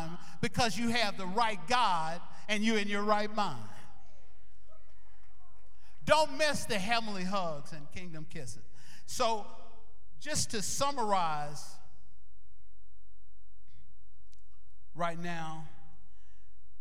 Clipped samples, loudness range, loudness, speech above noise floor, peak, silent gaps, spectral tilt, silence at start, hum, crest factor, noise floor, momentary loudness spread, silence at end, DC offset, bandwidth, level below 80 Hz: under 0.1%; 12 LU; -32 LUFS; 31 dB; -10 dBFS; none; -3.5 dB/octave; 0 s; none; 24 dB; -64 dBFS; 18 LU; 1.1 s; 3%; 16.5 kHz; -60 dBFS